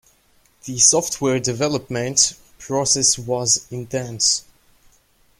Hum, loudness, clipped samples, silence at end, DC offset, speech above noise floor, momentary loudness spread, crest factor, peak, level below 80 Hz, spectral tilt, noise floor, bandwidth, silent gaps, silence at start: none; -18 LUFS; under 0.1%; 1 s; under 0.1%; 38 dB; 13 LU; 20 dB; 0 dBFS; -54 dBFS; -2.5 dB/octave; -58 dBFS; 16.5 kHz; none; 0.65 s